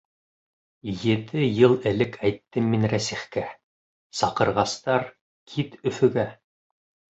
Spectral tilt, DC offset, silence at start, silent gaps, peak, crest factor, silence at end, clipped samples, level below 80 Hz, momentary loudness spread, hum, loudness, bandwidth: -6 dB/octave; under 0.1%; 0.85 s; 3.63-4.10 s, 5.21-5.46 s; -4 dBFS; 22 dB; 0.85 s; under 0.1%; -56 dBFS; 14 LU; none; -24 LUFS; 8.2 kHz